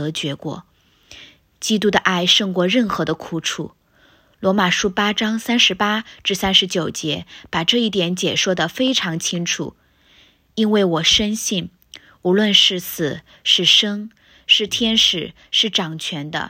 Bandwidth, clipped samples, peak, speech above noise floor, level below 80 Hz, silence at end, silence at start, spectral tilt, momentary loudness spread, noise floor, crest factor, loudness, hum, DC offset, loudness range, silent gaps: 16 kHz; under 0.1%; 0 dBFS; 36 dB; -52 dBFS; 0 s; 0 s; -3 dB/octave; 12 LU; -55 dBFS; 20 dB; -17 LUFS; none; under 0.1%; 4 LU; none